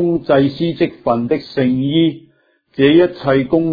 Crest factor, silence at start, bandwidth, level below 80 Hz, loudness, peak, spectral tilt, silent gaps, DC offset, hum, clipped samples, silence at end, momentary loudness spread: 14 dB; 0 s; 5 kHz; -48 dBFS; -15 LUFS; 0 dBFS; -9.5 dB/octave; none; under 0.1%; none; under 0.1%; 0 s; 7 LU